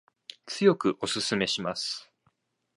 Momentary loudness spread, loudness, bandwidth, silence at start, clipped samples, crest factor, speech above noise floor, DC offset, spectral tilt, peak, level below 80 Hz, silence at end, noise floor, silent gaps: 15 LU; -27 LUFS; 11.5 kHz; 0.45 s; under 0.1%; 22 dB; 45 dB; under 0.1%; -4 dB/octave; -8 dBFS; -68 dBFS; 0.75 s; -72 dBFS; none